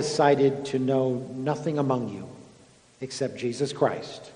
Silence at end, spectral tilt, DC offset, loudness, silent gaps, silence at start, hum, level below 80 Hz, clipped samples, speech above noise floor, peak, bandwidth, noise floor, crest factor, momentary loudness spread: 0 s; -6 dB/octave; under 0.1%; -26 LUFS; none; 0 s; none; -66 dBFS; under 0.1%; 29 dB; -6 dBFS; 10 kHz; -55 dBFS; 20 dB; 15 LU